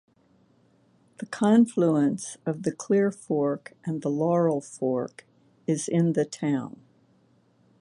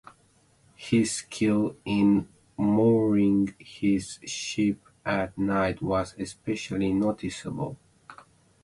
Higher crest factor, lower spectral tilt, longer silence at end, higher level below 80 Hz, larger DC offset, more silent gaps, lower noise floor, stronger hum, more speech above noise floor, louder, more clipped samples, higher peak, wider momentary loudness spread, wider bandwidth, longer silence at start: about the same, 18 dB vs 16 dB; about the same, -7 dB/octave vs -6 dB/octave; first, 1.1 s vs 0.5 s; second, -74 dBFS vs -54 dBFS; neither; neither; about the same, -63 dBFS vs -63 dBFS; neither; about the same, 38 dB vs 37 dB; about the same, -26 LUFS vs -27 LUFS; neither; about the same, -10 dBFS vs -10 dBFS; about the same, 13 LU vs 12 LU; about the same, 11.5 kHz vs 11.5 kHz; first, 1.2 s vs 0.8 s